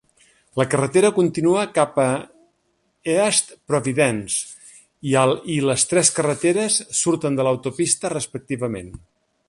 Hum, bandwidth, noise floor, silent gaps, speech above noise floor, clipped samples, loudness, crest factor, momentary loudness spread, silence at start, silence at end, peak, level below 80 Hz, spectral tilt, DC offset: none; 11.5 kHz; -68 dBFS; none; 48 dB; under 0.1%; -20 LUFS; 22 dB; 11 LU; 0.55 s; 0.5 s; 0 dBFS; -56 dBFS; -4 dB/octave; under 0.1%